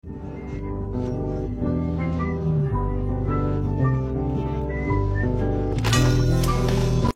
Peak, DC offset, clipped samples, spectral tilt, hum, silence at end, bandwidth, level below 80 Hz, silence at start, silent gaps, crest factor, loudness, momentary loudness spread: -6 dBFS; under 0.1%; under 0.1%; -6.5 dB/octave; none; 0.05 s; 16 kHz; -30 dBFS; 0.05 s; none; 16 dB; -24 LUFS; 8 LU